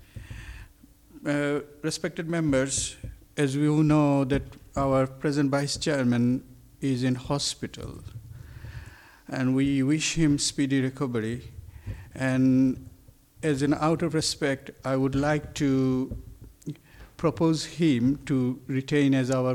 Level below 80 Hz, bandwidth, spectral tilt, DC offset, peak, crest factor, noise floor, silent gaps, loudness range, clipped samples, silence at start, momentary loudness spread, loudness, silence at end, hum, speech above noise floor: -48 dBFS; 14.5 kHz; -5.5 dB/octave; under 0.1%; -10 dBFS; 16 dB; -54 dBFS; none; 4 LU; under 0.1%; 0.15 s; 19 LU; -26 LUFS; 0 s; none; 29 dB